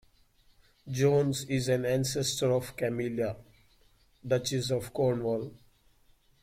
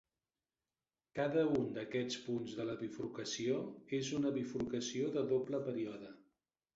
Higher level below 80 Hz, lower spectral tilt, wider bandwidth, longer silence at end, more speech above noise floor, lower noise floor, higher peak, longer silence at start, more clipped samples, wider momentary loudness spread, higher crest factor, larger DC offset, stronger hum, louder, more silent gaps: first, -60 dBFS vs -74 dBFS; about the same, -5 dB/octave vs -5 dB/octave; first, 16.5 kHz vs 7.8 kHz; first, 0.85 s vs 0.6 s; second, 35 dB vs over 52 dB; second, -64 dBFS vs under -90 dBFS; first, -14 dBFS vs -24 dBFS; second, 0.85 s vs 1.15 s; neither; about the same, 9 LU vs 8 LU; about the same, 18 dB vs 16 dB; neither; neither; first, -30 LUFS vs -39 LUFS; neither